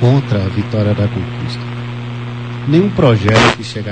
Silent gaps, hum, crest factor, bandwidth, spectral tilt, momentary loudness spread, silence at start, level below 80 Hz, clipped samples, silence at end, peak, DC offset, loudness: none; 60 Hz at -25 dBFS; 14 dB; 9.2 kHz; -6.5 dB/octave; 14 LU; 0 s; -40 dBFS; under 0.1%; 0 s; 0 dBFS; 0.6%; -15 LUFS